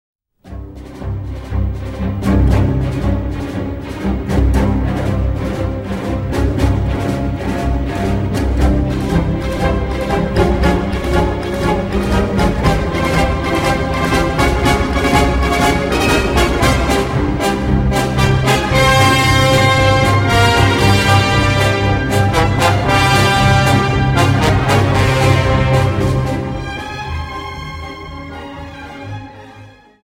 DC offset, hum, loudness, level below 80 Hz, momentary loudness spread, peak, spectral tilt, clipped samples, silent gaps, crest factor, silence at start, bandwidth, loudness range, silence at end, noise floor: under 0.1%; none; -14 LUFS; -22 dBFS; 14 LU; 0 dBFS; -5.5 dB/octave; under 0.1%; none; 14 dB; 0.45 s; 16.5 kHz; 7 LU; 0.35 s; -40 dBFS